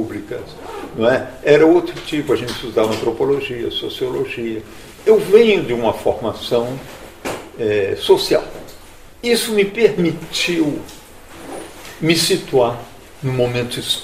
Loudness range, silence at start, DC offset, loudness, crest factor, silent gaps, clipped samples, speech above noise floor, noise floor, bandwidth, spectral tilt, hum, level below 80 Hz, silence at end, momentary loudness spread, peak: 3 LU; 0 s; 0.4%; -17 LUFS; 18 dB; none; under 0.1%; 22 dB; -39 dBFS; 15.5 kHz; -4.5 dB/octave; none; -46 dBFS; 0 s; 18 LU; 0 dBFS